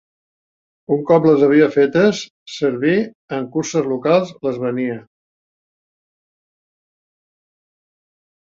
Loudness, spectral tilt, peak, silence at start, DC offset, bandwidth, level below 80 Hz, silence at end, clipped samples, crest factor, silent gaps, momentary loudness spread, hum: -17 LUFS; -6 dB/octave; -2 dBFS; 0.9 s; under 0.1%; 7.6 kHz; -62 dBFS; 3.45 s; under 0.1%; 18 dB; 2.30-2.46 s, 3.15-3.28 s; 13 LU; none